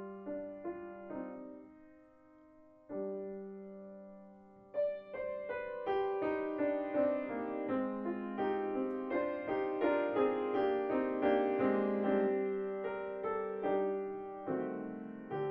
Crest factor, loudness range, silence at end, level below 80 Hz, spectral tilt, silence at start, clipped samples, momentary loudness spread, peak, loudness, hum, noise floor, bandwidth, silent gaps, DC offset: 18 dB; 13 LU; 0 s; -72 dBFS; -5.5 dB/octave; 0 s; under 0.1%; 14 LU; -20 dBFS; -36 LUFS; none; -62 dBFS; 5.2 kHz; none; under 0.1%